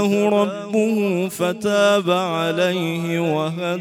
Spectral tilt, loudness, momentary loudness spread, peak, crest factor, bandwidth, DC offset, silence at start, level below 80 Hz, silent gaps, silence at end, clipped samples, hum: -5.5 dB/octave; -20 LUFS; 6 LU; -6 dBFS; 14 dB; 16 kHz; under 0.1%; 0 s; -66 dBFS; none; 0 s; under 0.1%; none